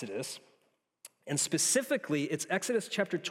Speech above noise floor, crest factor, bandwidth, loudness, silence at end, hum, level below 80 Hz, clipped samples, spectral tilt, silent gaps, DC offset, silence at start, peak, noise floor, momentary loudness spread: 42 dB; 18 dB; 16.5 kHz; -31 LUFS; 0 s; none; -84 dBFS; under 0.1%; -3 dB/octave; none; under 0.1%; 0 s; -16 dBFS; -74 dBFS; 13 LU